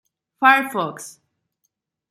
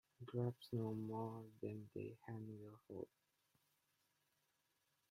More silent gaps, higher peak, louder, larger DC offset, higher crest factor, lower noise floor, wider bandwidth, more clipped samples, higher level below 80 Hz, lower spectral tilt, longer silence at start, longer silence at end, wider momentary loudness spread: neither; first, -2 dBFS vs -30 dBFS; first, -18 LUFS vs -50 LUFS; neither; about the same, 22 dB vs 20 dB; second, -75 dBFS vs -85 dBFS; about the same, 15.5 kHz vs 15.5 kHz; neither; first, -76 dBFS vs -84 dBFS; second, -3 dB/octave vs -9 dB/octave; first, 0.4 s vs 0.2 s; second, 1 s vs 2.05 s; first, 22 LU vs 10 LU